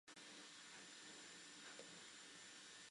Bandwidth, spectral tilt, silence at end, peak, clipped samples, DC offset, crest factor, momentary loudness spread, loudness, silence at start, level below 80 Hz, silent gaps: 11.5 kHz; -0.5 dB/octave; 0 s; -40 dBFS; under 0.1%; under 0.1%; 20 dB; 1 LU; -57 LUFS; 0.05 s; under -90 dBFS; none